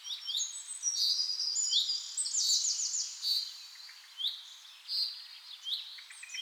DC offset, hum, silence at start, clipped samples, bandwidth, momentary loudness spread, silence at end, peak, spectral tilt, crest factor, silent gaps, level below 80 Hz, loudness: under 0.1%; none; 0 s; under 0.1%; 19.5 kHz; 18 LU; 0 s; -16 dBFS; 10.5 dB/octave; 18 dB; none; under -90 dBFS; -31 LUFS